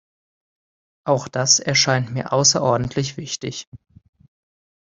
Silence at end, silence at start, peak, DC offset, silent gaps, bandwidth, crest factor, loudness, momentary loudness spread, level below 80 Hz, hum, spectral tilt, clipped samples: 1.1 s; 1.05 s; -2 dBFS; under 0.1%; 3.67-3.72 s; 7.8 kHz; 20 dB; -18 LUFS; 13 LU; -54 dBFS; none; -3 dB/octave; under 0.1%